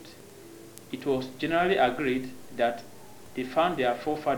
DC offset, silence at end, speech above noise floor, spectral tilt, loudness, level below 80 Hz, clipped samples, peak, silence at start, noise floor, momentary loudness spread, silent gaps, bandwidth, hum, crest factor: under 0.1%; 0 s; 21 dB; -5.5 dB/octave; -28 LUFS; -58 dBFS; under 0.1%; -12 dBFS; 0 s; -48 dBFS; 23 LU; none; over 20 kHz; none; 18 dB